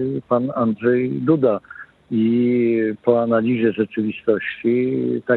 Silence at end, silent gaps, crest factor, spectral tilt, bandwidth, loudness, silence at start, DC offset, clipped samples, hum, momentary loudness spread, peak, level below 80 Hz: 0 s; none; 16 dB; -10.5 dB/octave; 4.2 kHz; -19 LUFS; 0 s; under 0.1%; under 0.1%; none; 5 LU; -4 dBFS; -64 dBFS